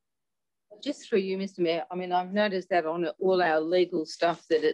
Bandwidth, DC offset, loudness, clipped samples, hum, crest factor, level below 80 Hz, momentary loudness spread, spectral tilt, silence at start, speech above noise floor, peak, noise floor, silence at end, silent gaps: 9.8 kHz; under 0.1%; -28 LUFS; under 0.1%; none; 14 dB; -80 dBFS; 7 LU; -5.5 dB/octave; 0.7 s; 63 dB; -12 dBFS; -90 dBFS; 0 s; none